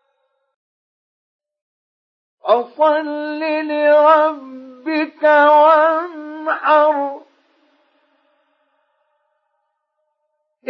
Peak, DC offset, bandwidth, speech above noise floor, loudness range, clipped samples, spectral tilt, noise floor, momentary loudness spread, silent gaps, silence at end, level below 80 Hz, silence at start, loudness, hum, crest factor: -2 dBFS; under 0.1%; 5.8 kHz; 58 dB; 8 LU; under 0.1%; -4.5 dB/octave; -72 dBFS; 18 LU; none; 3.5 s; under -90 dBFS; 2.45 s; -15 LUFS; none; 16 dB